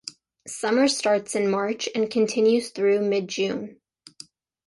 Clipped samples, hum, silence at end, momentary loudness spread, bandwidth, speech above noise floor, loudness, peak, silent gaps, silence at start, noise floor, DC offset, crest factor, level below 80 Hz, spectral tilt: under 0.1%; none; 0.95 s; 18 LU; 11.5 kHz; 27 dB; -23 LUFS; -10 dBFS; none; 0.05 s; -49 dBFS; under 0.1%; 14 dB; -70 dBFS; -4 dB/octave